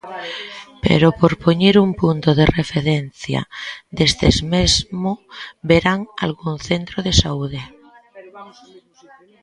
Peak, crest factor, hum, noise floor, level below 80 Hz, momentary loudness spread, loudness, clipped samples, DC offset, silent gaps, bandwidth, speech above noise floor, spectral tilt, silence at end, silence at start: 0 dBFS; 18 dB; none; -49 dBFS; -34 dBFS; 15 LU; -17 LUFS; under 0.1%; under 0.1%; none; 11 kHz; 31 dB; -5 dB/octave; 0.95 s; 0.05 s